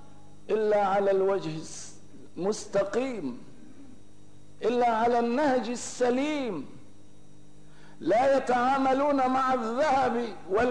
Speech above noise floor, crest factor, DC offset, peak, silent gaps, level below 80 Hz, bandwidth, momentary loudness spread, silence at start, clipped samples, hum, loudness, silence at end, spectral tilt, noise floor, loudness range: 29 dB; 12 dB; 0.8%; -16 dBFS; none; -60 dBFS; 10.5 kHz; 14 LU; 0.5 s; under 0.1%; 50 Hz at -60 dBFS; -27 LUFS; 0 s; -5 dB/octave; -55 dBFS; 6 LU